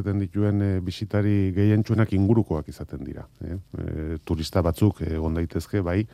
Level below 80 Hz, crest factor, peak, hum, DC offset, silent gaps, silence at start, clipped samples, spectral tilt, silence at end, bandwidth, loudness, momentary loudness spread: -44 dBFS; 18 dB; -6 dBFS; none; under 0.1%; none; 0 s; under 0.1%; -8 dB/octave; 0.1 s; 14 kHz; -24 LUFS; 14 LU